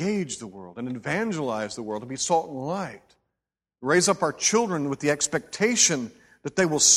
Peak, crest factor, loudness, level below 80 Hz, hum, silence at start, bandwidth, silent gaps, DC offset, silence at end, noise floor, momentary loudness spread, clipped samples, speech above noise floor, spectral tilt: -6 dBFS; 20 dB; -25 LUFS; -64 dBFS; none; 0 s; 15.5 kHz; none; under 0.1%; 0 s; -87 dBFS; 15 LU; under 0.1%; 62 dB; -2.5 dB/octave